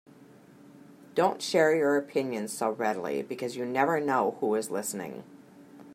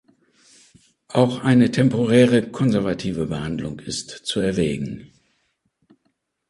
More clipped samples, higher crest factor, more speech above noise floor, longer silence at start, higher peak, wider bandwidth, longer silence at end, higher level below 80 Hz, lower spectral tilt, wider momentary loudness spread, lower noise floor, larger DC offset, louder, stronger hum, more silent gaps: neither; about the same, 20 dB vs 20 dB; second, 26 dB vs 51 dB; second, 0.2 s vs 1.1 s; second, -10 dBFS vs -2 dBFS; first, 16 kHz vs 11.5 kHz; second, 0 s vs 1.45 s; second, -80 dBFS vs -50 dBFS; second, -4.5 dB/octave vs -6.5 dB/octave; second, 10 LU vs 13 LU; second, -54 dBFS vs -71 dBFS; neither; second, -28 LUFS vs -20 LUFS; neither; neither